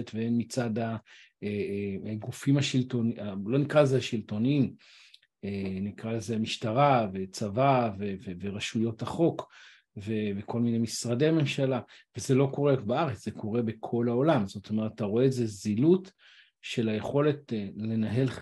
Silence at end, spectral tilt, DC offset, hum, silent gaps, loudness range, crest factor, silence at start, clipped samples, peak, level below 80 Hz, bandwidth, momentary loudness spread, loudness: 0 s; -6.5 dB/octave; under 0.1%; none; none; 2 LU; 20 dB; 0 s; under 0.1%; -8 dBFS; -68 dBFS; 12.5 kHz; 11 LU; -29 LUFS